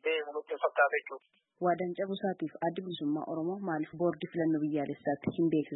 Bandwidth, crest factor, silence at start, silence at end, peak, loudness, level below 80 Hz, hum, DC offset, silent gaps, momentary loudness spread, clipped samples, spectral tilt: 4.1 kHz; 18 dB; 0.05 s; 0 s; -14 dBFS; -33 LUFS; -78 dBFS; none; under 0.1%; none; 7 LU; under 0.1%; -10 dB/octave